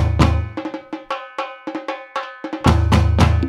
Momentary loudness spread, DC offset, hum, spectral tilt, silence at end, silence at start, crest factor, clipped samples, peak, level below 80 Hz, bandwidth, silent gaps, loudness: 14 LU; under 0.1%; none; -6.5 dB/octave; 0 s; 0 s; 18 dB; under 0.1%; 0 dBFS; -24 dBFS; 11.5 kHz; none; -20 LUFS